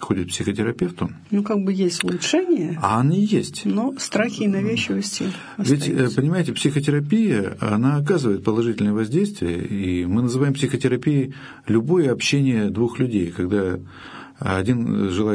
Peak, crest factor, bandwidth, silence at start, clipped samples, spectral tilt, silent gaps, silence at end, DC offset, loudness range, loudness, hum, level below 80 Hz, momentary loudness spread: -2 dBFS; 18 dB; 11 kHz; 0 s; under 0.1%; -6 dB/octave; none; 0 s; under 0.1%; 1 LU; -21 LUFS; none; -54 dBFS; 6 LU